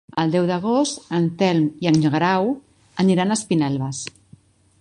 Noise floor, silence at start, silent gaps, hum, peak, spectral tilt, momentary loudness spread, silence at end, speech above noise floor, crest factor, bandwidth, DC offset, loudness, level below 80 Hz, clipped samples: -52 dBFS; 0.15 s; none; none; -4 dBFS; -5.5 dB/octave; 10 LU; 0.7 s; 32 dB; 18 dB; 11.5 kHz; under 0.1%; -20 LUFS; -58 dBFS; under 0.1%